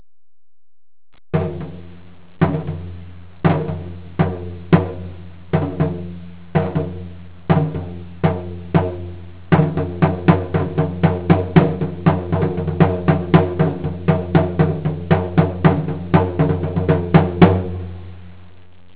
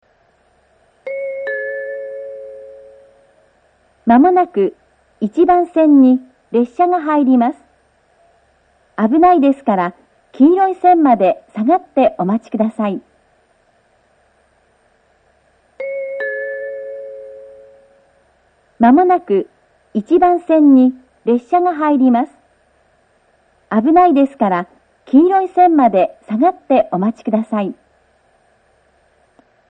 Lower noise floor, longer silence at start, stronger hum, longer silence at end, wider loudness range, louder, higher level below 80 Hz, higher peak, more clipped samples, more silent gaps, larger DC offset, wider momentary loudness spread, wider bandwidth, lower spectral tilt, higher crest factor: second, -47 dBFS vs -57 dBFS; first, 1.35 s vs 1.05 s; neither; second, 0.5 s vs 1.95 s; second, 6 LU vs 14 LU; second, -18 LUFS vs -14 LUFS; first, -34 dBFS vs -56 dBFS; about the same, 0 dBFS vs 0 dBFS; neither; neither; first, 1% vs under 0.1%; about the same, 18 LU vs 17 LU; about the same, 4 kHz vs 4.2 kHz; first, -12.5 dB/octave vs -9 dB/octave; about the same, 18 dB vs 16 dB